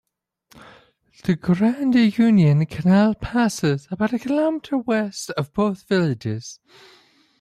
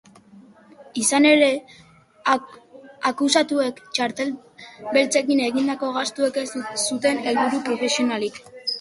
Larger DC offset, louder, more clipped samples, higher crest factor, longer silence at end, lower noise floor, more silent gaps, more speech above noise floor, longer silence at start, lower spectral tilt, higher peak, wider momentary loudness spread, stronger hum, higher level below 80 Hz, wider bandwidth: neither; about the same, -20 LUFS vs -21 LUFS; neither; second, 14 dB vs 20 dB; first, 0.85 s vs 0 s; first, -60 dBFS vs -49 dBFS; neither; first, 40 dB vs 28 dB; first, 1.25 s vs 0.35 s; first, -7 dB/octave vs -2 dB/octave; second, -8 dBFS vs -4 dBFS; about the same, 11 LU vs 11 LU; neither; first, -50 dBFS vs -68 dBFS; first, 13.5 kHz vs 11.5 kHz